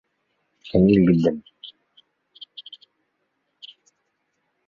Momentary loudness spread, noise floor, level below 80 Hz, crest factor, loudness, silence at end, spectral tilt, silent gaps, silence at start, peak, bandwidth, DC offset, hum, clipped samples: 26 LU; -74 dBFS; -50 dBFS; 20 dB; -19 LUFS; 3 s; -9 dB/octave; none; 0.75 s; -6 dBFS; 6.8 kHz; under 0.1%; none; under 0.1%